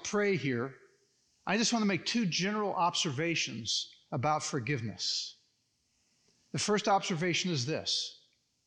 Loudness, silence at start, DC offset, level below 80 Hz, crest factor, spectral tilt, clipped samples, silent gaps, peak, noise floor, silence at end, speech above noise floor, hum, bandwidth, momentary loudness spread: -32 LUFS; 0 s; under 0.1%; -76 dBFS; 16 dB; -3.5 dB/octave; under 0.1%; none; -16 dBFS; -76 dBFS; 0.55 s; 44 dB; none; 10.5 kHz; 7 LU